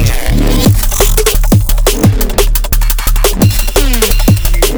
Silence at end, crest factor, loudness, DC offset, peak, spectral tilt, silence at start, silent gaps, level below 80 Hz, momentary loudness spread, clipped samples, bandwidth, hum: 0 s; 8 dB; -11 LUFS; under 0.1%; 0 dBFS; -4.5 dB/octave; 0 s; none; -10 dBFS; 3 LU; under 0.1%; over 20 kHz; none